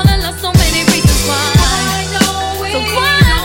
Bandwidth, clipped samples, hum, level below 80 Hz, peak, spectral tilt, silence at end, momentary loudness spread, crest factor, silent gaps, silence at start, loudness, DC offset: 17.5 kHz; 0.3%; none; -18 dBFS; 0 dBFS; -4 dB/octave; 0 s; 6 LU; 12 dB; none; 0 s; -12 LUFS; under 0.1%